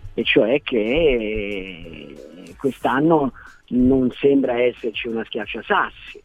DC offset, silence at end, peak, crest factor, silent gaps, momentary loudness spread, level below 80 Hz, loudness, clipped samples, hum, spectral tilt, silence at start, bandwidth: under 0.1%; 0.05 s; -2 dBFS; 18 dB; none; 18 LU; -40 dBFS; -20 LUFS; under 0.1%; none; -7 dB/octave; 0 s; 11 kHz